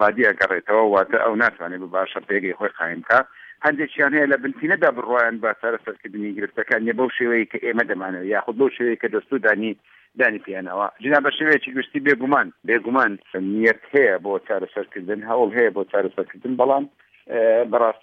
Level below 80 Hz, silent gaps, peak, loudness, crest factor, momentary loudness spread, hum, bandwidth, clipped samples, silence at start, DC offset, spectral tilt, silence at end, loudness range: -70 dBFS; none; -2 dBFS; -20 LUFS; 18 dB; 10 LU; none; 6.6 kHz; under 0.1%; 0 s; under 0.1%; -7 dB/octave; 0.1 s; 3 LU